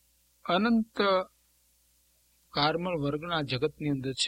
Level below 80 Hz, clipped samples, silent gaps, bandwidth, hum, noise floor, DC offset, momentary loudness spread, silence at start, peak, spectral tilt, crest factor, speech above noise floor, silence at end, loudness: -60 dBFS; under 0.1%; none; 15.5 kHz; 60 Hz at -60 dBFS; -67 dBFS; under 0.1%; 7 LU; 0.45 s; -10 dBFS; -5 dB/octave; 20 dB; 39 dB; 0 s; -29 LUFS